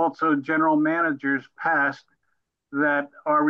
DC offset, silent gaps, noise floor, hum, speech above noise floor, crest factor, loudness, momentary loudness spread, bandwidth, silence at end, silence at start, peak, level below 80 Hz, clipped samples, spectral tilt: under 0.1%; none; -75 dBFS; none; 52 dB; 12 dB; -23 LUFS; 6 LU; 6.4 kHz; 0 s; 0 s; -10 dBFS; -80 dBFS; under 0.1%; -7.5 dB/octave